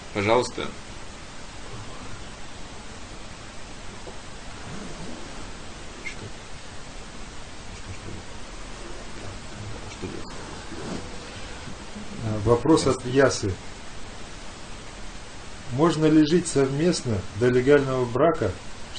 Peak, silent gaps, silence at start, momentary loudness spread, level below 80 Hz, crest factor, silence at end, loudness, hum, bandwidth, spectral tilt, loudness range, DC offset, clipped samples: -6 dBFS; none; 0 s; 20 LU; -44 dBFS; 22 dB; 0 s; -24 LUFS; none; 10 kHz; -5.5 dB/octave; 17 LU; under 0.1%; under 0.1%